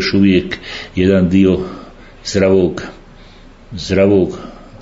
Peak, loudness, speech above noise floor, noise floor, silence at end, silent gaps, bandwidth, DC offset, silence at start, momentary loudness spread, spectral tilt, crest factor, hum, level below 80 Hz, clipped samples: 0 dBFS; -14 LUFS; 26 dB; -39 dBFS; 0 s; none; 7.8 kHz; under 0.1%; 0 s; 19 LU; -6.5 dB/octave; 14 dB; none; -40 dBFS; under 0.1%